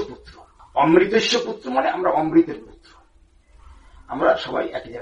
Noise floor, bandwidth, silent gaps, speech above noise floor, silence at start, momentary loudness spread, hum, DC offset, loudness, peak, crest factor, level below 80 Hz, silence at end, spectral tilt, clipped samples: -54 dBFS; 8.2 kHz; none; 35 dB; 0 s; 13 LU; none; under 0.1%; -20 LUFS; -2 dBFS; 20 dB; -50 dBFS; 0 s; -4.5 dB/octave; under 0.1%